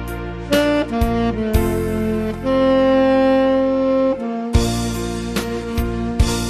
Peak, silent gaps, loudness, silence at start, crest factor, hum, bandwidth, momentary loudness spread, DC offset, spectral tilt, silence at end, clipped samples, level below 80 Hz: -2 dBFS; none; -18 LUFS; 0 s; 16 dB; none; 14 kHz; 9 LU; under 0.1%; -6 dB/octave; 0 s; under 0.1%; -28 dBFS